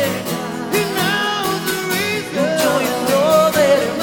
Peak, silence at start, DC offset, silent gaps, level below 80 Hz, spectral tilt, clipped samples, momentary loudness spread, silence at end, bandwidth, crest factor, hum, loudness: -2 dBFS; 0 s; under 0.1%; none; -54 dBFS; -3.5 dB/octave; under 0.1%; 7 LU; 0 s; over 20 kHz; 14 dB; none; -17 LUFS